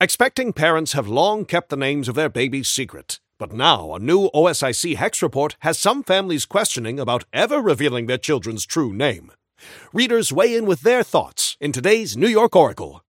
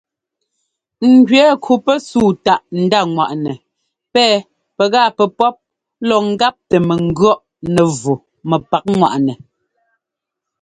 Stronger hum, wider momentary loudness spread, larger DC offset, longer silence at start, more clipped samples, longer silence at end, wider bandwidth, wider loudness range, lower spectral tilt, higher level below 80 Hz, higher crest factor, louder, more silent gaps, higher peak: neither; second, 6 LU vs 9 LU; neither; second, 0 s vs 1 s; neither; second, 0.1 s vs 1.25 s; first, 17 kHz vs 11 kHz; about the same, 2 LU vs 3 LU; second, -3.5 dB/octave vs -5.5 dB/octave; second, -56 dBFS vs -50 dBFS; first, 20 dB vs 14 dB; second, -19 LUFS vs -14 LUFS; neither; about the same, 0 dBFS vs 0 dBFS